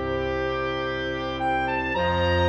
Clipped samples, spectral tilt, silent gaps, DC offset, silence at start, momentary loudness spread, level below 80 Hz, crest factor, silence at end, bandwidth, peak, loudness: under 0.1%; -6.5 dB/octave; none; under 0.1%; 0 s; 4 LU; -40 dBFS; 14 dB; 0 s; 8.4 kHz; -12 dBFS; -25 LUFS